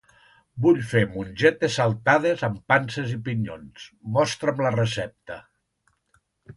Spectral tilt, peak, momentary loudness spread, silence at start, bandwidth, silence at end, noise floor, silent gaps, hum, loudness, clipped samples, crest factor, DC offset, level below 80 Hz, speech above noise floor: -6 dB/octave; -4 dBFS; 20 LU; 0.55 s; 11.5 kHz; 0.05 s; -70 dBFS; none; none; -23 LUFS; under 0.1%; 20 dB; under 0.1%; -56 dBFS; 47 dB